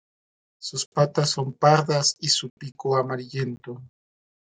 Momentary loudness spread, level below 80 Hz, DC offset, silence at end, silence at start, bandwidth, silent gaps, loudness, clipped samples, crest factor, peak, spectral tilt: 18 LU; -68 dBFS; under 0.1%; 0.65 s; 0.6 s; 9.6 kHz; 0.86-0.92 s, 2.50-2.57 s; -23 LUFS; under 0.1%; 22 dB; -4 dBFS; -4 dB/octave